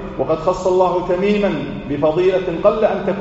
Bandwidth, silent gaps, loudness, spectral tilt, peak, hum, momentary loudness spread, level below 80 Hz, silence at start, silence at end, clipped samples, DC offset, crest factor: 8 kHz; none; -17 LUFS; -5.5 dB/octave; -2 dBFS; none; 5 LU; -40 dBFS; 0 s; 0 s; under 0.1%; under 0.1%; 16 dB